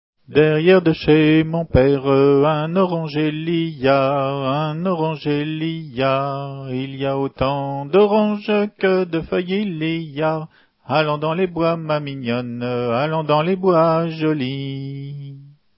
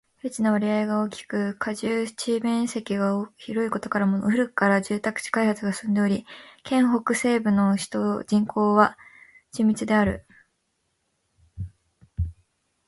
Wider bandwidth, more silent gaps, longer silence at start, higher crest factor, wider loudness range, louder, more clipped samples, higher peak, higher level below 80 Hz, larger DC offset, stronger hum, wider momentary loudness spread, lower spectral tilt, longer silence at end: second, 5.8 kHz vs 11.5 kHz; neither; about the same, 0.3 s vs 0.25 s; about the same, 16 dB vs 20 dB; about the same, 5 LU vs 4 LU; first, -19 LUFS vs -24 LUFS; neither; about the same, -2 dBFS vs -4 dBFS; about the same, -44 dBFS vs -48 dBFS; neither; neither; about the same, 10 LU vs 12 LU; first, -11.5 dB/octave vs -6 dB/octave; second, 0.3 s vs 0.55 s